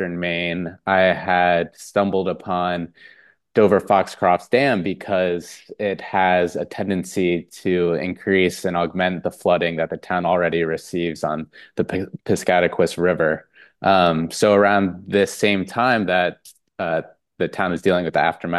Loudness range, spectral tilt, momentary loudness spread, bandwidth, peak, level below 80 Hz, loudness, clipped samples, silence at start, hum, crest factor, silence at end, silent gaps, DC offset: 3 LU; -5.5 dB/octave; 9 LU; 12.5 kHz; -2 dBFS; -56 dBFS; -20 LUFS; under 0.1%; 0 s; none; 18 dB; 0 s; none; under 0.1%